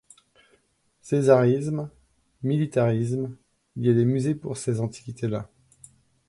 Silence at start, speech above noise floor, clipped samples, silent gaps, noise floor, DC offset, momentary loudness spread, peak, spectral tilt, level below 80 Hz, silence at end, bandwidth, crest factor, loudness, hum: 1.05 s; 43 dB; under 0.1%; none; -66 dBFS; under 0.1%; 14 LU; -6 dBFS; -8 dB/octave; -62 dBFS; 0.85 s; 11.5 kHz; 20 dB; -25 LUFS; none